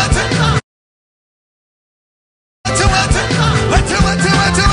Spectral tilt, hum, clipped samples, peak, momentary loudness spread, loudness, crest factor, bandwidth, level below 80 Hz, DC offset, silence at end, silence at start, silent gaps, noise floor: -4 dB/octave; none; under 0.1%; -2 dBFS; 5 LU; -13 LUFS; 12 dB; 10.5 kHz; -22 dBFS; under 0.1%; 0 s; 0 s; 0.63-2.64 s; under -90 dBFS